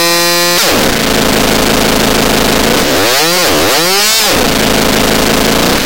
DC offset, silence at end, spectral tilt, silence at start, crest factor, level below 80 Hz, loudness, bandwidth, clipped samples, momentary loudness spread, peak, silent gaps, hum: 7%; 0 s; -2.5 dB/octave; 0 s; 8 dB; -26 dBFS; -8 LUFS; 17.5 kHz; under 0.1%; 2 LU; 0 dBFS; none; none